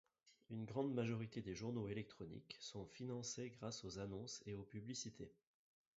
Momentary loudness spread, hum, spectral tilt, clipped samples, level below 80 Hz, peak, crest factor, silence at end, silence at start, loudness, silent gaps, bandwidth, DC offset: 10 LU; none; -6 dB/octave; under 0.1%; -74 dBFS; -30 dBFS; 20 dB; 0.65 s; 0.25 s; -49 LUFS; none; 7.6 kHz; under 0.1%